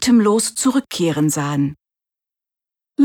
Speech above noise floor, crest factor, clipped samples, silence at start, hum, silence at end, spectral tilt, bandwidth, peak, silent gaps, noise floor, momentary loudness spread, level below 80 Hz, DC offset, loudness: 72 dB; 14 dB; under 0.1%; 0 s; none; 0 s; -4.5 dB/octave; 18 kHz; -6 dBFS; none; -88 dBFS; 9 LU; -56 dBFS; under 0.1%; -18 LUFS